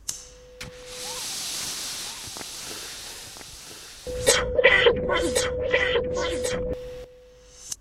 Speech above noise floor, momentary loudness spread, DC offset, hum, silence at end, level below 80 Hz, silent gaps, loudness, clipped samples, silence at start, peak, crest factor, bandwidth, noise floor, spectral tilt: 25 dB; 21 LU; under 0.1%; none; 0.05 s; -44 dBFS; none; -24 LUFS; under 0.1%; 0 s; -2 dBFS; 26 dB; 16 kHz; -50 dBFS; -2 dB/octave